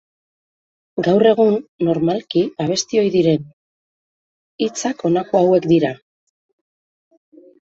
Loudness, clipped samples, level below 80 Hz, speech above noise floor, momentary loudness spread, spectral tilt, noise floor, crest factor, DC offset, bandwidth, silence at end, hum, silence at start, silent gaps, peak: -17 LUFS; under 0.1%; -60 dBFS; over 74 dB; 9 LU; -5.5 dB/octave; under -90 dBFS; 18 dB; under 0.1%; 8 kHz; 1.8 s; none; 0.95 s; 1.68-1.79 s, 3.53-4.59 s; -2 dBFS